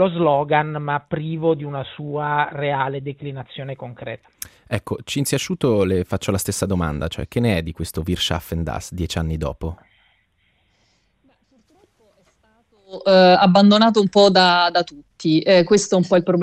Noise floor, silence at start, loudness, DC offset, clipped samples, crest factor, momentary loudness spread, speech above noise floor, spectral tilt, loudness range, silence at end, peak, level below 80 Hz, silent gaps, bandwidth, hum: -64 dBFS; 0 s; -18 LUFS; under 0.1%; under 0.1%; 18 dB; 19 LU; 45 dB; -5 dB/octave; 14 LU; 0 s; -2 dBFS; -44 dBFS; none; 15.5 kHz; none